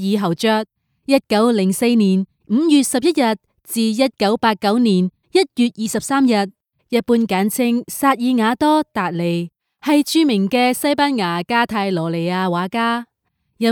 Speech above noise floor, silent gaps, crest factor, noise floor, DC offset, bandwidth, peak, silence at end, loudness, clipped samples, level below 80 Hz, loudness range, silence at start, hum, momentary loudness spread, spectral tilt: 53 dB; none; 16 dB; -70 dBFS; under 0.1%; 18.5 kHz; -2 dBFS; 0 s; -17 LUFS; under 0.1%; -60 dBFS; 1 LU; 0 s; none; 7 LU; -5 dB/octave